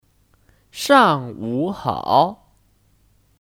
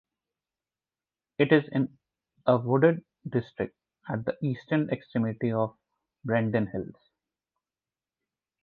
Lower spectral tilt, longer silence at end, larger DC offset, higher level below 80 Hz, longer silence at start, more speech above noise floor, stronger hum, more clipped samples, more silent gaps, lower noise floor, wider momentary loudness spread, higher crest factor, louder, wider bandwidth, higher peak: second, -5 dB/octave vs -10 dB/octave; second, 1.1 s vs 1.7 s; neither; first, -56 dBFS vs -64 dBFS; second, 0.75 s vs 1.4 s; second, 41 dB vs over 63 dB; neither; neither; neither; second, -59 dBFS vs under -90 dBFS; about the same, 13 LU vs 13 LU; about the same, 20 dB vs 24 dB; first, -18 LUFS vs -28 LUFS; first, 17.5 kHz vs 4.7 kHz; first, 0 dBFS vs -6 dBFS